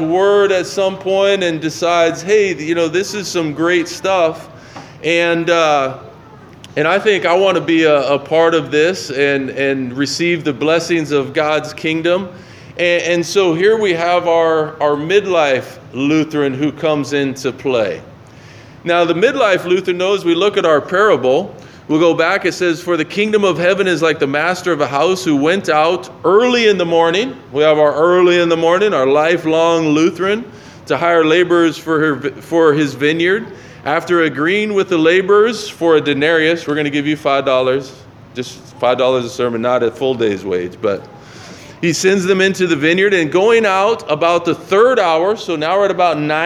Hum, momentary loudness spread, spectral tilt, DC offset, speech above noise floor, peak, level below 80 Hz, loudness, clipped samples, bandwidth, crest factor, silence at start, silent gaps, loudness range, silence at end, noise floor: none; 8 LU; -4.5 dB/octave; under 0.1%; 24 dB; 0 dBFS; -58 dBFS; -14 LUFS; under 0.1%; 13.5 kHz; 14 dB; 0 s; none; 4 LU; 0 s; -38 dBFS